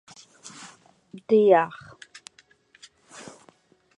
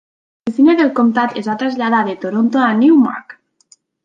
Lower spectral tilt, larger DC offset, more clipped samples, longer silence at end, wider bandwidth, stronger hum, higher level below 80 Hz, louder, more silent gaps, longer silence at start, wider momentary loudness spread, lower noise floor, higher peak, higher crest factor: second, -5.5 dB/octave vs -7 dB/octave; neither; neither; first, 2.2 s vs 0.75 s; first, 11 kHz vs 7.4 kHz; neither; second, -76 dBFS vs -64 dBFS; second, -20 LUFS vs -14 LUFS; neither; first, 1.15 s vs 0.45 s; first, 28 LU vs 9 LU; first, -59 dBFS vs -53 dBFS; second, -6 dBFS vs -2 dBFS; first, 22 dB vs 12 dB